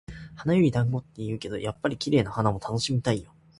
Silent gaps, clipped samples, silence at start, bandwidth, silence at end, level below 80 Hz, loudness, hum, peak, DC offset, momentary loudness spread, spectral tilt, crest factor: none; under 0.1%; 0.1 s; 11.5 kHz; 0.35 s; -52 dBFS; -27 LUFS; none; -6 dBFS; under 0.1%; 10 LU; -6.5 dB/octave; 20 dB